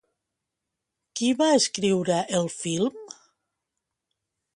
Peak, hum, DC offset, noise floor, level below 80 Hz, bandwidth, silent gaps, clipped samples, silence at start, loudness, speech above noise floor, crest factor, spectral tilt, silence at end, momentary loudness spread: -8 dBFS; none; under 0.1%; -84 dBFS; -70 dBFS; 11.5 kHz; none; under 0.1%; 1.15 s; -24 LUFS; 60 dB; 20 dB; -4 dB/octave; 1.5 s; 15 LU